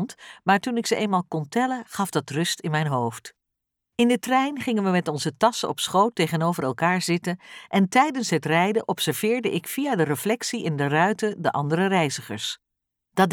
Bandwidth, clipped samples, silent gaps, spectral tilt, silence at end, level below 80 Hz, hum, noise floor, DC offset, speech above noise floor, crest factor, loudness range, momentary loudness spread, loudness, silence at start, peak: 19.5 kHz; under 0.1%; none; -5 dB/octave; 0 s; -70 dBFS; none; -83 dBFS; under 0.1%; 59 dB; 18 dB; 2 LU; 7 LU; -24 LUFS; 0 s; -6 dBFS